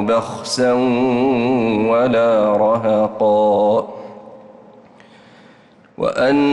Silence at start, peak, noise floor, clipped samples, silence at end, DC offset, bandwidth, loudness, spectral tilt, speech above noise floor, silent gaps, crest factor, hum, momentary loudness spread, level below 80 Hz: 0 s; -6 dBFS; -48 dBFS; under 0.1%; 0 s; under 0.1%; 12 kHz; -16 LUFS; -5.5 dB/octave; 33 dB; none; 10 dB; none; 8 LU; -54 dBFS